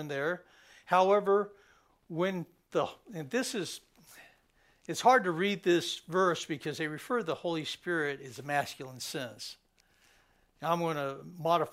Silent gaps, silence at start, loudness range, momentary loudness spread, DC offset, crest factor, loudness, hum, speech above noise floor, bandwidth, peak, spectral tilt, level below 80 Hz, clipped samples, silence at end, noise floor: none; 0 s; 7 LU; 15 LU; under 0.1%; 20 dB; -32 LUFS; none; 36 dB; 16 kHz; -12 dBFS; -4.5 dB/octave; -74 dBFS; under 0.1%; 0 s; -68 dBFS